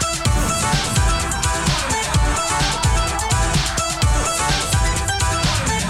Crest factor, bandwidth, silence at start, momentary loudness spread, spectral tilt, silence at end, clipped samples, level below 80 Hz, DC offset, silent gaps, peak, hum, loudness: 14 dB; 16 kHz; 0 s; 1 LU; -3 dB/octave; 0 s; under 0.1%; -24 dBFS; under 0.1%; none; -4 dBFS; none; -18 LUFS